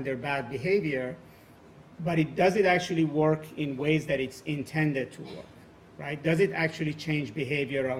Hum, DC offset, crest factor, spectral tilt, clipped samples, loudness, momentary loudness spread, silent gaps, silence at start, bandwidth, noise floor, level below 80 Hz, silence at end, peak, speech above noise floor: none; under 0.1%; 18 dB; -6.5 dB/octave; under 0.1%; -28 LUFS; 13 LU; none; 0 s; 15 kHz; -53 dBFS; -60 dBFS; 0 s; -10 dBFS; 25 dB